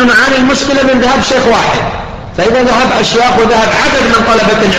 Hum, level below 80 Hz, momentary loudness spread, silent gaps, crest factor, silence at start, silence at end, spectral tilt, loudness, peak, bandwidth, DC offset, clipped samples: none; -30 dBFS; 6 LU; none; 8 dB; 0 s; 0 s; -4 dB/octave; -8 LUFS; 0 dBFS; 14.5 kHz; 2%; under 0.1%